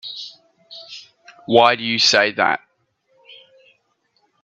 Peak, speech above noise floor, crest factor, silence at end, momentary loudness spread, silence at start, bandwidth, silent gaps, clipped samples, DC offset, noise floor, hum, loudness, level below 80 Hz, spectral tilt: 0 dBFS; 50 dB; 22 dB; 1.85 s; 25 LU; 0.05 s; 8.6 kHz; none; under 0.1%; under 0.1%; -66 dBFS; none; -16 LUFS; -70 dBFS; -2.5 dB/octave